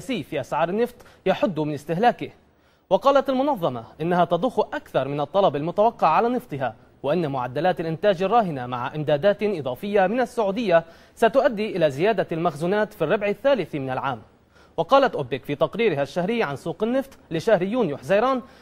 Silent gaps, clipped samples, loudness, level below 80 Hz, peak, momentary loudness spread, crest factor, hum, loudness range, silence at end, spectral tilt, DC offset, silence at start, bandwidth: none; under 0.1%; -23 LUFS; -56 dBFS; -4 dBFS; 9 LU; 18 dB; none; 2 LU; 0.15 s; -6.5 dB/octave; under 0.1%; 0 s; 15.5 kHz